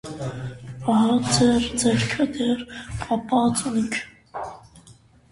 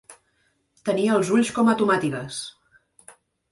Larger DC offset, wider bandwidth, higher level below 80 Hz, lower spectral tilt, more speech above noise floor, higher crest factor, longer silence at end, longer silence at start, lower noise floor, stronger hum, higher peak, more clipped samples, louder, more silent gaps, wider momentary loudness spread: neither; about the same, 11.5 kHz vs 11.5 kHz; first, -48 dBFS vs -64 dBFS; about the same, -4.5 dB/octave vs -5 dB/octave; second, 30 dB vs 47 dB; about the same, 18 dB vs 18 dB; second, 0.4 s vs 1 s; about the same, 0.05 s vs 0.1 s; second, -52 dBFS vs -68 dBFS; neither; about the same, -6 dBFS vs -8 dBFS; neither; about the same, -22 LUFS vs -22 LUFS; neither; first, 16 LU vs 13 LU